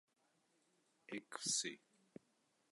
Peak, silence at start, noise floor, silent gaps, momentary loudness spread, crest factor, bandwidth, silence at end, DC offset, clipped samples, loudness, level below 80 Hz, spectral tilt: -28 dBFS; 1.1 s; -81 dBFS; none; 25 LU; 24 dB; 11.5 kHz; 0.95 s; under 0.1%; under 0.1%; -43 LUFS; under -90 dBFS; -0.5 dB/octave